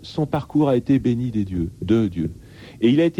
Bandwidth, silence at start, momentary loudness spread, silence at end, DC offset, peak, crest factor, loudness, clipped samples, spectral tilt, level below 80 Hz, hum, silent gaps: 16.5 kHz; 0 s; 9 LU; 0.1 s; under 0.1%; -6 dBFS; 14 dB; -21 LUFS; under 0.1%; -8.5 dB/octave; -44 dBFS; none; none